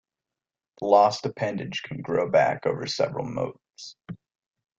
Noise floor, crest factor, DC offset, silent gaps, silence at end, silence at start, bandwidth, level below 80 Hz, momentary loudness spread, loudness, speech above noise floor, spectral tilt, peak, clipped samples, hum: -90 dBFS; 22 dB; under 0.1%; none; 0.65 s; 0.8 s; 7.8 kHz; -64 dBFS; 23 LU; -25 LUFS; 65 dB; -5 dB/octave; -4 dBFS; under 0.1%; none